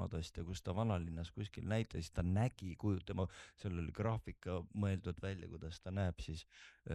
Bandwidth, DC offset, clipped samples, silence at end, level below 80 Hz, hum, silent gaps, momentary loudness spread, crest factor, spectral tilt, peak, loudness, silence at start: 11.5 kHz; under 0.1%; under 0.1%; 0 s; -56 dBFS; none; none; 10 LU; 16 dB; -7 dB/octave; -24 dBFS; -42 LUFS; 0 s